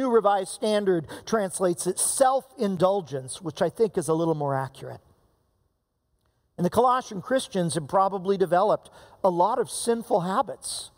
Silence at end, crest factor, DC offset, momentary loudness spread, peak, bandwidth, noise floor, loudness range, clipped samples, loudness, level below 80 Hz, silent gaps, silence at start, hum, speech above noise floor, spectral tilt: 0.1 s; 18 dB; under 0.1%; 8 LU; -8 dBFS; 16 kHz; -74 dBFS; 5 LU; under 0.1%; -25 LUFS; -64 dBFS; none; 0 s; none; 49 dB; -4.5 dB/octave